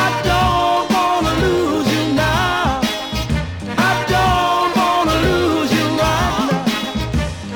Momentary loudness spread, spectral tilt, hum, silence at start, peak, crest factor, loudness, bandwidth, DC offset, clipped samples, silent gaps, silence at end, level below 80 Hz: 6 LU; -5 dB/octave; none; 0 s; -4 dBFS; 12 dB; -16 LUFS; over 20 kHz; under 0.1%; under 0.1%; none; 0 s; -30 dBFS